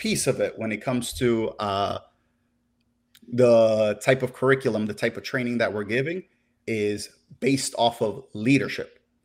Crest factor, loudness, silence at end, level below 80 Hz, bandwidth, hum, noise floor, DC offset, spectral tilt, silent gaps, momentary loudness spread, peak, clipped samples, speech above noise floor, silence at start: 20 dB; -24 LUFS; 0.4 s; -58 dBFS; 16 kHz; none; -70 dBFS; under 0.1%; -5 dB/octave; none; 11 LU; -6 dBFS; under 0.1%; 47 dB; 0 s